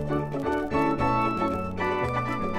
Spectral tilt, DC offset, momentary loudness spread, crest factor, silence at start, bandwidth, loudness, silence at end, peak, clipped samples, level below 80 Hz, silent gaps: -7.5 dB/octave; under 0.1%; 4 LU; 14 dB; 0 s; 15.5 kHz; -26 LUFS; 0 s; -12 dBFS; under 0.1%; -44 dBFS; none